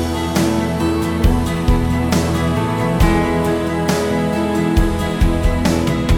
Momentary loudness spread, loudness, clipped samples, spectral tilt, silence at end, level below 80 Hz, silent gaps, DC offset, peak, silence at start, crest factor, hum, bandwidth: 2 LU; -17 LUFS; under 0.1%; -6 dB/octave; 0 s; -22 dBFS; none; under 0.1%; -2 dBFS; 0 s; 14 dB; none; 18.5 kHz